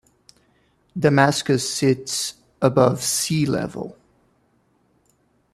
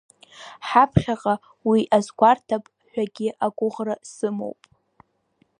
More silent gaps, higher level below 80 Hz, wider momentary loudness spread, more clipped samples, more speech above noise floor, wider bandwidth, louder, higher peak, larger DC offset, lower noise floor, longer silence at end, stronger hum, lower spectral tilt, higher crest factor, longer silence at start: neither; second, -56 dBFS vs -50 dBFS; about the same, 13 LU vs 15 LU; neither; about the same, 44 dB vs 44 dB; first, 15 kHz vs 10.5 kHz; about the same, -20 LUFS vs -22 LUFS; about the same, -2 dBFS vs -2 dBFS; neither; about the same, -63 dBFS vs -66 dBFS; first, 1.6 s vs 1.1 s; neither; second, -4.5 dB/octave vs -6.5 dB/octave; about the same, 20 dB vs 20 dB; first, 0.95 s vs 0.4 s